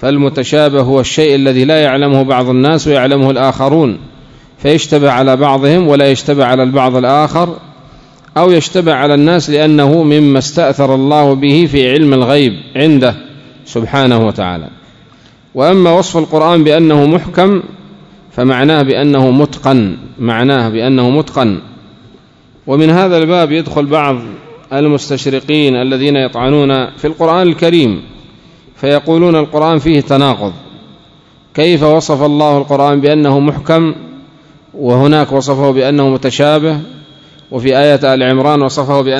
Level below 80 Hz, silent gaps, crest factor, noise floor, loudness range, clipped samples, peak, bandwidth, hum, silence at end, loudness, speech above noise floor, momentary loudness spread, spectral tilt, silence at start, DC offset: -42 dBFS; none; 10 dB; -43 dBFS; 3 LU; 1%; 0 dBFS; 11 kHz; none; 0 s; -10 LUFS; 34 dB; 8 LU; -6.5 dB/octave; 0 s; under 0.1%